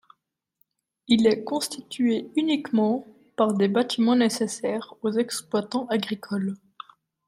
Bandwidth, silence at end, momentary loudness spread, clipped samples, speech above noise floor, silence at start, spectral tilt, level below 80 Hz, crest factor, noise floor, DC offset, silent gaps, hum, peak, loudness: 15.5 kHz; 0.7 s; 10 LU; under 0.1%; 50 dB; 1.1 s; -5 dB/octave; -68 dBFS; 20 dB; -74 dBFS; under 0.1%; none; none; -6 dBFS; -25 LUFS